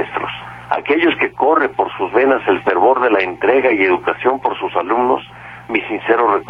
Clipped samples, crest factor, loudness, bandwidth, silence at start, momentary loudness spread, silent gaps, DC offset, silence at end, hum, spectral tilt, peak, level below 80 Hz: under 0.1%; 14 dB; -16 LUFS; 5.4 kHz; 0 s; 8 LU; none; under 0.1%; 0 s; none; -6.5 dB/octave; -2 dBFS; -52 dBFS